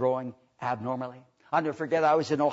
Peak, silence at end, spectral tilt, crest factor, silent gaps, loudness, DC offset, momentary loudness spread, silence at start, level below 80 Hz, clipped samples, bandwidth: -12 dBFS; 0 s; -6.5 dB/octave; 16 dB; none; -28 LUFS; under 0.1%; 12 LU; 0 s; -74 dBFS; under 0.1%; 8 kHz